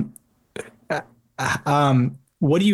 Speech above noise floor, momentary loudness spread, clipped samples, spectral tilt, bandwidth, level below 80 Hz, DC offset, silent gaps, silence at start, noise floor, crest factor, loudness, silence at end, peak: 28 dB; 19 LU; under 0.1%; -6 dB/octave; 12.5 kHz; -58 dBFS; under 0.1%; none; 0 s; -47 dBFS; 16 dB; -22 LUFS; 0 s; -6 dBFS